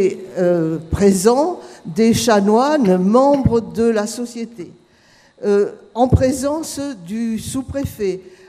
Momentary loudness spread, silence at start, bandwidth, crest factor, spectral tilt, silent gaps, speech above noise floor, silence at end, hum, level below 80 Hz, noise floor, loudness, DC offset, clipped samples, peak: 13 LU; 0 s; 15.5 kHz; 16 dB; -6 dB/octave; none; 35 dB; 0.2 s; none; -38 dBFS; -52 dBFS; -17 LUFS; under 0.1%; under 0.1%; 0 dBFS